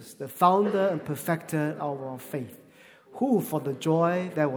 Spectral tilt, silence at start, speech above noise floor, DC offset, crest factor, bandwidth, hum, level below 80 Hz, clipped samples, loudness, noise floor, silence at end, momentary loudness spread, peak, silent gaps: -6.5 dB/octave; 0 s; 27 dB; under 0.1%; 20 dB; over 20 kHz; none; -74 dBFS; under 0.1%; -27 LUFS; -54 dBFS; 0 s; 14 LU; -8 dBFS; none